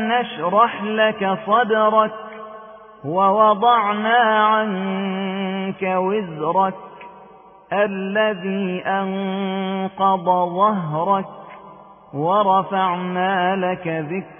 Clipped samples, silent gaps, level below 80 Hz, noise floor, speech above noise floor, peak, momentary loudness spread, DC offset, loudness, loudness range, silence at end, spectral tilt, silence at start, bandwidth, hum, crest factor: under 0.1%; none; -66 dBFS; -45 dBFS; 26 dB; -2 dBFS; 10 LU; under 0.1%; -19 LUFS; 5 LU; 0.05 s; -10.5 dB/octave; 0 s; 3.6 kHz; none; 18 dB